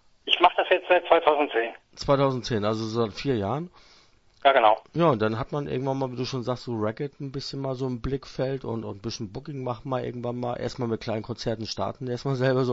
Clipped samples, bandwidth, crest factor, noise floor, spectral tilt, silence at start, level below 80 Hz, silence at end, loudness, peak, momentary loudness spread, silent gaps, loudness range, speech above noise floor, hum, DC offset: under 0.1%; 8 kHz; 26 dB; -57 dBFS; -6 dB/octave; 0.25 s; -52 dBFS; 0 s; -26 LUFS; 0 dBFS; 13 LU; none; 7 LU; 31 dB; none; under 0.1%